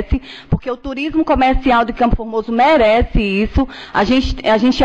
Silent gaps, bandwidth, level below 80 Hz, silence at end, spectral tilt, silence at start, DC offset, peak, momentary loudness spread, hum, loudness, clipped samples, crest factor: none; 8.2 kHz; -24 dBFS; 0 s; -6.5 dB/octave; 0 s; 0.2%; -6 dBFS; 10 LU; none; -15 LUFS; under 0.1%; 10 dB